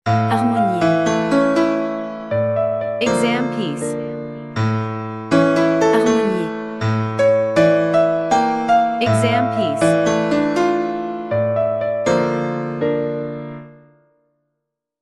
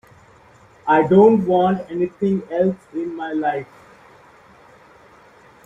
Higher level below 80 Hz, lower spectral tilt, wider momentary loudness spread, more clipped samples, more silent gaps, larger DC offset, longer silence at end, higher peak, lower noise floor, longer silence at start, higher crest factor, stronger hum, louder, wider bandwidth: first, -54 dBFS vs -60 dBFS; second, -6.5 dB/octave vs -9 dB/octave; second, 10 LU vs 16 LU; neither; neither; neither; second, 1.3 s vs 2 s; about the same, -2 dBFS vs -2 dBFS; first, -78 dBFS vs -49 dBFS; second, 0.05 s vs 0.85 s; about the same, 16 dB vs 18 dB; neither; about the same, -18 LUFS vs -18 LUFS; first, 12 kHz vs 7.4 kHz